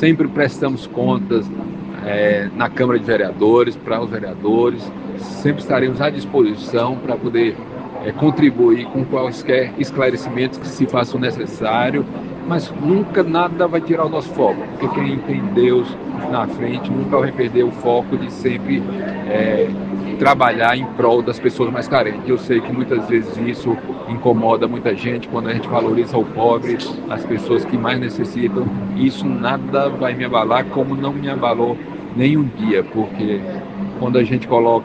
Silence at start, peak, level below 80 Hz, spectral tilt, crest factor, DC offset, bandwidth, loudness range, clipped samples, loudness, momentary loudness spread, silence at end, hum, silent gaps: 0 s; 0 dBFS; -50 dBFS; -7.5 dB/octave; 18 dB; under 0.1%; 8.6 kHz; 2 LU; under 0.1%; -18 LUFS; 8 LU; 0 s; none; none